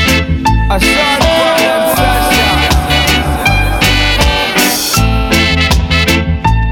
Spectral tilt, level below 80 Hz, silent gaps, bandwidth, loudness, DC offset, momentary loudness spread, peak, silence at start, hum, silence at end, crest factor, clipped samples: -4 dB/octave; -16 dBFS; none; 19.5 kHz; -10 LUFS; under 0.1%; 2 LU; 0 dBFS; 0 s; none; 0 s; 10 dB; under 0.1%